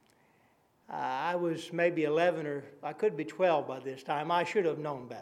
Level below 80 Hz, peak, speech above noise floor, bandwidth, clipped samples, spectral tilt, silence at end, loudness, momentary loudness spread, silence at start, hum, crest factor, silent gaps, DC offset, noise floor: -86 dBFS; -14 dBFS; 37 dB; 13 kHz; under 0.1%; -6 dB/octave; 0 s; -32 LUFS; 11 LU; 0.9 s; none; 18 dB; none; under 0.1%; -68 dBFS